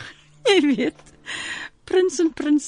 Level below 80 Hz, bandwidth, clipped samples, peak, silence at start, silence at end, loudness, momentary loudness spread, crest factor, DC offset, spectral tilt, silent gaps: -58 dBFS; 10.5 kHz; under 0.1%; -4 dBFS; 0 s; 0 s; -21 LUFS; 15 LU; 18 dB; under 0.1%; -3 dB/octave; none